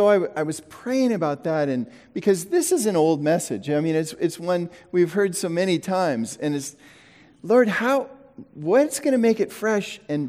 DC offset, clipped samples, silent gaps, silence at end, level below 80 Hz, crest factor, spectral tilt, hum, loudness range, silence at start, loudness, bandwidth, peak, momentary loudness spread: under 0.1%; under 0.1%; none; 0 s; -70 dBFS; 16 dB; -5 dB/octave; none; 2 LU; 0 s; -23 LUFS; 16.5 kHz; -6 dBFS; 9 LU